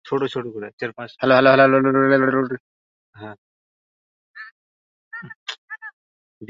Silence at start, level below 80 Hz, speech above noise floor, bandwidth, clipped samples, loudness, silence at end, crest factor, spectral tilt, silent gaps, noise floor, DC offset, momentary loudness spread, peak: 0.05 s; -66 dBFS; over 72 dB; 7.2 kHz; under 0.1%; -18 LUFS; 0.05 s; 20 dB; -7 dB/octave; 0.73-0.78 s, 2.60-3.13 s, 3.38-4.34 s, 4.51-5.11 s, 5.35-5.46 s, 5.58-5.68 s, 5.93-6.41 s; under -90 dBFS; under 0.1%; 26 LU; -2 dBFS